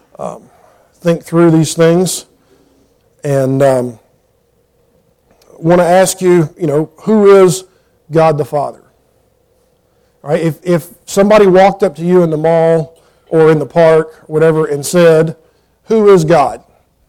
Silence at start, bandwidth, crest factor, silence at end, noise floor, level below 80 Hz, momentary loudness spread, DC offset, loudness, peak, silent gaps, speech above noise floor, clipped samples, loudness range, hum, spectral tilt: 0.2 s; 16.5 kHz; 12 dB; 0.5 s; -56 dBFS; -48 dBFS; 12 LU; under 0.1%; -11 LUFS; 0 dBFS; none; 46 dB; under 0.1%; 6 LU; none; -6 dB/octave